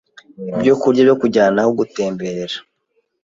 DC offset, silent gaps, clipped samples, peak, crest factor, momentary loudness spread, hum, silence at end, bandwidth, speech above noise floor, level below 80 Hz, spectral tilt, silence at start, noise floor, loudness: under 0.1%; none; under 0.1%; -2 dBFS; 16 dB; 14 LU; none; 0.65 s; 7.6 kHz; 51 dB; -58 dBFS; -6 dB/octave; 0.4 s; -67 dBFS; -16 LUFS